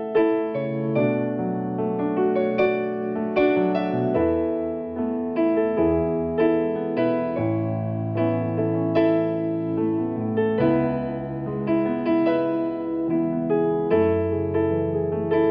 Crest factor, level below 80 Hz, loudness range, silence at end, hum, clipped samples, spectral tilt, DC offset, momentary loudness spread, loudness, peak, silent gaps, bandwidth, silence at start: 12 dB; -52 dBFS; 1 LU; 0 s; none; under 0.1%; -7.5 dB/octave; under 0.1%; 6 LU; -23 LUFS; -10 dBFS; none; 5.2 kHz; 0 s